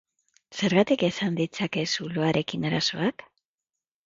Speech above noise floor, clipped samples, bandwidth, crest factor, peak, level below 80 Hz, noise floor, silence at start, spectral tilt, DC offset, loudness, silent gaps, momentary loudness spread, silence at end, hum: 63 dB; under 0.1%; 7.8 kHz; 20 dB; -8 dBFS; -64 dBFS; -89 dBFS; 0.5 s; -5 dB/octave; under 0.1%; -26 LUFS; none; 7 LU; 0.85 s; none